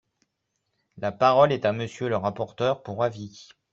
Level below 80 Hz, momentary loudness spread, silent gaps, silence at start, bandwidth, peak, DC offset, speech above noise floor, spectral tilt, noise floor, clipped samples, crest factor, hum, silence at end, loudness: -64 dBFS; 14 LU; none; 0.95 s; 7.8 kHz; -6 dBFS; under 0.1%; 54 dB; -6.5 dB/octave; -78 dBFS; under 0.1%; 20 dB; none; 0.3 s; -25 LUFS